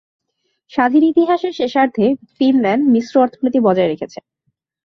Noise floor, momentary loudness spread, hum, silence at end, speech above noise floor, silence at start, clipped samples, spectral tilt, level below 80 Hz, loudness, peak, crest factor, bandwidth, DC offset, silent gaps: -70 dBFS; 6 LU; none; 0.8 s; 55 dB; 0.75 s; under 0.1%; -7 dB/octave; -60 dBFS; -15 LUFS; -2 dBFS; 14 dB; 6.4 kHz; under 0.1%; none